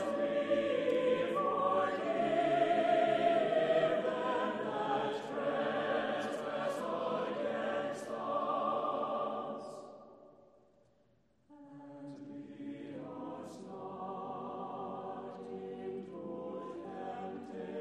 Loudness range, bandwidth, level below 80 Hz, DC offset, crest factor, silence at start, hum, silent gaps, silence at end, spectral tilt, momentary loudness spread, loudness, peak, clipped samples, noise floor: 17 LU; 12 kHz; -82 dBFS; under 0.1%; 18 dB; 0 s; none; none; 0 s; -5.5 dB/octave; 16 LU; -35 LUFS; -18 dBFS; under 0.1%; -72 dBFS